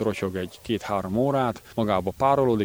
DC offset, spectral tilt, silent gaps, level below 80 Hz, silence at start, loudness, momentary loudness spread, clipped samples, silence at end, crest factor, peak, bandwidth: under 0.1%; -7 dB/octave; none; -52 dBFS; 0 s; -25 LUFS; 8 LU; under 0.1%; 0 s; 16 dB; -8 dBFS; over 20 kHz